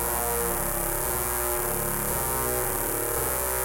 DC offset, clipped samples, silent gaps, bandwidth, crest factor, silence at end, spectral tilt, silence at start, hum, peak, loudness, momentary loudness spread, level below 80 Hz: under 0.1%; under 0.1%; none; 17.5 kHz; 18 dB; 0 s; -3 dB/octave; 0 s; none; -8 dBFS; -25 LUFS; 1 LU; -38 dBFS